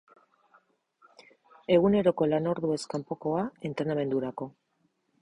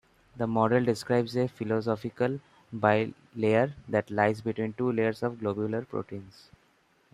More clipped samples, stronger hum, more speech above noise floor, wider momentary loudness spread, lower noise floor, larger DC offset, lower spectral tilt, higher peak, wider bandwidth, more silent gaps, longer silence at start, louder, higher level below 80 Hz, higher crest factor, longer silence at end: neither; neither; first, 46 dB vs 38 dB; first, 13 LU vs 10 LU; first, -74 dBFS vs -66 dBFS; neither; about the same, -7 dB/octave vs -7.5 dB/octave; about the same, -10 dBFS vs -8 dBFS; second, 11 kHz vs 13 kHz; neither; first, 1.7 s vs 0.35 s; about the same, -28 LUFS vs -29 LUFS; about the same, -64 dBFS vs -64 dBFS; about the same, 20 dB vs 22 dB; about the same, 0.75 s vs 0.85 s